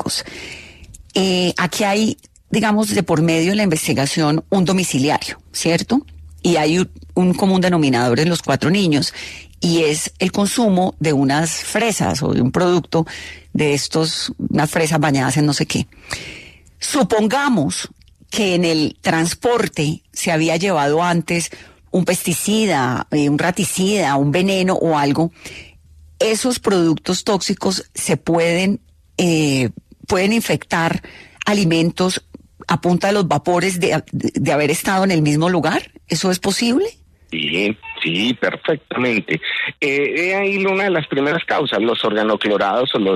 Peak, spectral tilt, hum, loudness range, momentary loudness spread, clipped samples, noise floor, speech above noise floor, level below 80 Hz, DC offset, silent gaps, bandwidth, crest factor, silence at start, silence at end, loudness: -2 dBFS; -4.5 dB/octave; none; 2 LU; 7 LU; under 0.1%; -46 dBFS; 28 dB; -48 dBFS; under 0.1%; none; 14 kHz; 16 dB; 0 s; 0 s; -17 LUFS